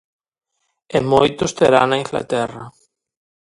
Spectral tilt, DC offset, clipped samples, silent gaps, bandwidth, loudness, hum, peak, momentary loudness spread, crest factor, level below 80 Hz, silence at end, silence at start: -5 dB/octave; under 0.1%; under 0.1%; none; 11.5 kHz; -17 LUFS; none; 0 dBFS; 9 LU; 20 dB; -50 dBFS; 0.9 s; 0.9 s